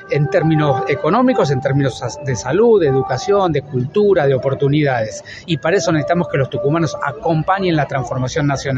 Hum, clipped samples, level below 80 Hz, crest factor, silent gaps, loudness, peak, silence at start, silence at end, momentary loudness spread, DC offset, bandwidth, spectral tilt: none; under 0.1%; -46 dBFS; 14 dB; none; -16 LUFS; -2 dBFS; 0 s; 0 s; 7 LU; under 0.1%; 8.2 kHz; -6.5 dB/octave